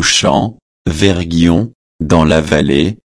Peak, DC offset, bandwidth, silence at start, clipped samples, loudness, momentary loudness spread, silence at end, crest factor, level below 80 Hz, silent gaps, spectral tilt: 0 dBFS; under 0.1%; 11 kHz; 0 s; under 0.1%; -12 LUFS; 12 LU; 0.2 s; 12 dB; -30 dBFS; 0.62-0.85 s, 1.75-1.99 s; -4.5 dB/octave